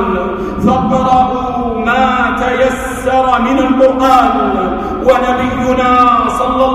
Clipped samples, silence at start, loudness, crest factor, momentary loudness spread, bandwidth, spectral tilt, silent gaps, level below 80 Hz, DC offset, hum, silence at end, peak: under 0.1%; 0 s; -11 LUFS; 12 dB; 7 LU; 14 kHz; -6 dB/octave; none; -30 dBFS; under 0.1%; none; 0 s; 0 dBFS